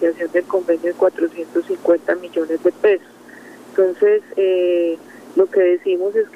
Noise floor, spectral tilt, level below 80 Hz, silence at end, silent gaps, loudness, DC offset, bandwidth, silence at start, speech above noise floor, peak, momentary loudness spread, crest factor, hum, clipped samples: -41 dBFS; -5.5 dB/octave; -70 dBFS; 0.1 s; none; -18 LUFS; under 0.1%; 11.5 kHz; 0 s; 24 dB; -2 dBFS; 7 LU; 14 dB; 60 Hz at -50 dBFS; under 0.1%